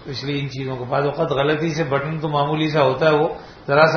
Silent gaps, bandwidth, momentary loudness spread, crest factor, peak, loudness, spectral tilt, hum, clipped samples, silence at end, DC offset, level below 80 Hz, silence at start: none; 6.6 kHz; 9 LU; 20 dB; 0 dBFS; -20 LUFS; -6.5 dB/octave; none; under 0.1%; 0 s; under 0.1%; -50 dBFS; 0 s